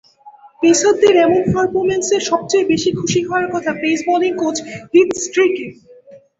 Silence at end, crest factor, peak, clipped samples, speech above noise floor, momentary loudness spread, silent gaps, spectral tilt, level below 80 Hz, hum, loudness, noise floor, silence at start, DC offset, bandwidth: 0.2 s; 14 dB; -2 dBFS; under 0.1%; 28 dB; 8 LU; none; -4 dB/octave; -50 dBFS; none; -15 LUFS; -43 dBFS; 0.25 s; under 0.1%; 8 kHz